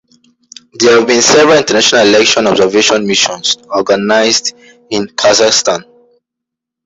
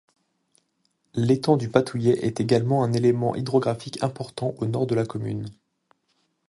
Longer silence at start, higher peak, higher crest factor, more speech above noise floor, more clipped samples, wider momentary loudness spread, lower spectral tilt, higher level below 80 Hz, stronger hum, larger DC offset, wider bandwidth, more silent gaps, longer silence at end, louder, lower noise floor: second, 0.75 s vs 1.15 s; about the same, 0 dBFS vs -2 dBFS; second, 10 dB vs 22 dB; first, 70 dB vs 49 dB; neither; about the same, 9 LU vs 9 LU; second, -2 dB/octave vs -7.5 dB/octave; first, -50 dBFS vs -60 dBFS; neither; neither; second, 8.2 kHz vs 11.5 kHz; neither; about the same, 1.05 s vs 0.95 s; first, -9 LUFS vs -24 LUFS; first, -79 dBFS vs -71 dBFS